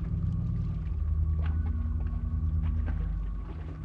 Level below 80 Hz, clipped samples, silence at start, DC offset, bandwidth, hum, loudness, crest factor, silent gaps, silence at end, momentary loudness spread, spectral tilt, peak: -32 dBFS; under 0.1%; 0 s; under 0.1%; 3.4 kHz; none; -32 LUFS; 10 dB; none; 0 s; 6 LU; -10.5 dB/octave; -20 dBFS